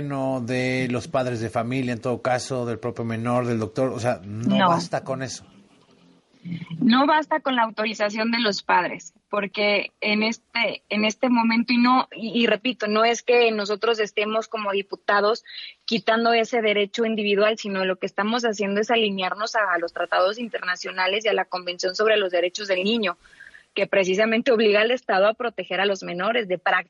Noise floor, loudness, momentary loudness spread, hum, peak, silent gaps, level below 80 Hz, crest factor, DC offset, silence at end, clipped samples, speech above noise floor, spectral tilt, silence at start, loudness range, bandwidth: -56 dBFS; -22 LUFS; 9 LU; none; -6 dBFS; none; -68 dBFS; 16 dB; under 0.1%; 0.05 s; under 0.1%; 34 dB; -4.5 dB/octave; 0 s; 4 LU; 11.5 kHz